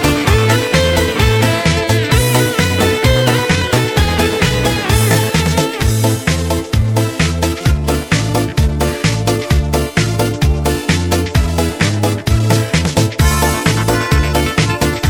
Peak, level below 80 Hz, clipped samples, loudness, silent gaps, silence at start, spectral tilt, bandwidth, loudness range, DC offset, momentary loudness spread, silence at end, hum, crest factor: 0 dBFS; -22 dBFS; under 0.1%; -14 LUFS; none; 0 s; -5 dB/octave; 19 kHz; 3 LU; under 0.1%; 4 LU; 0 s; none; 14 dB